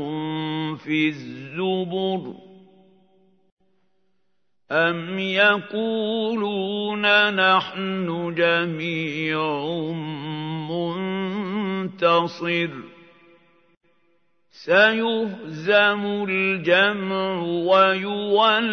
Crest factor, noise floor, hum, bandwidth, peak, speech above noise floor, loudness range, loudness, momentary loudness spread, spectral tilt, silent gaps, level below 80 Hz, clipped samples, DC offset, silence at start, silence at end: 20 dB; -77 dBFS; none; 6.6 kHz; -2 dBFS; 55 dB; 8 LU; -22 LUFS; 12 LU; -6.5 dB/octave; 3.52-3.57 s, 13.77-13.81 s; -76 dBFS; under 0.1%; under 0.1%; 0 s; 0 s